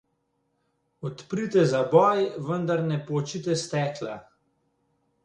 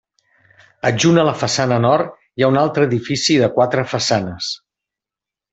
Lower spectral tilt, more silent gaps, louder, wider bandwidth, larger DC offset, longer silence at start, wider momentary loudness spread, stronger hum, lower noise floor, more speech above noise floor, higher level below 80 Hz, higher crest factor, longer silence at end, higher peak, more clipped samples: about the same, -6 dB/octave vs -5 dB/octave; neither; second, -25 LUFS vs -17 LUFS; first, 10.5 kHz vs 8.4 kHz; neither; first, 1 s vs 0.85 s; first, 17 LU vs 10 LU; neither; second, -74 dBFS vs -88 dBFS; second, 49 dB vs 72 dB; second, -68 dBFS vs -56 dBFS; first, 22 dB vs 16 dB; about the same, 1.05 s vs 0.95 s; about the same, -4 dBFS vs -2 dBFS; neither